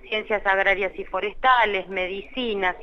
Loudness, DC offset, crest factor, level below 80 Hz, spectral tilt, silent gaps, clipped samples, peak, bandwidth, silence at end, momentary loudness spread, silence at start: -23 LUFS; under 0.1%; 18 dB; -44 dBFS; -5 dB/octave; none; under 0.1%; -6 dBFS; 6.8 kHz; 0 s; 10 LU; 0.05 s